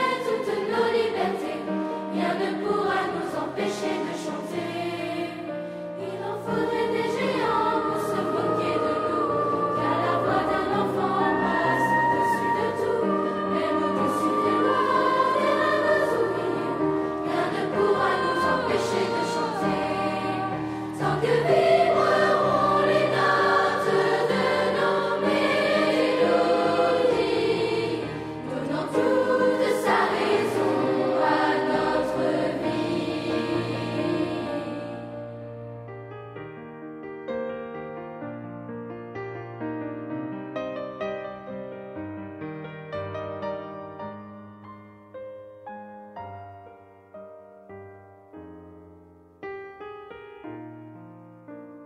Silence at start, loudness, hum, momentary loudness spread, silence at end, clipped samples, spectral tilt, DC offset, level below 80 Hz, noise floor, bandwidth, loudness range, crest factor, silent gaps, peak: 0 s; -24 LUFS; none; 18 LU; 0 s; under 0.1%; -5.5 dB/octave; under 0.1%; -60 dBFS; -52 dBFS; 15 kHz; 19 LU; 18 dB; none; -8 dBFS